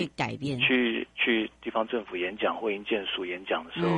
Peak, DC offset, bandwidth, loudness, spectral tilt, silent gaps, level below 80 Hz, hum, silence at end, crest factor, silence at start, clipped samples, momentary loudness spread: -12 dBFS; under 0.1%; 10 kHz; -28 LUFS; -6 dB/octave; none; -62 dBFS; none; 0 s; 18 dB; 0 s; under 0.1%; 8 LU